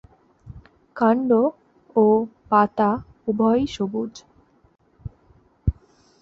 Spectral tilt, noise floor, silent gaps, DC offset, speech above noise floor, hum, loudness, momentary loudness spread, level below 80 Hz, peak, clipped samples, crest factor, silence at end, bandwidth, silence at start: -7.5 dB/octave; -57 dBFS; none; under 0.1%; 37 dB; none; -21 LUFS; 22 LU; -42 dBFS; -4 dBFS; under 0.1%; 20 dB; 0.5 s; 7.4 kHz; 0.45 s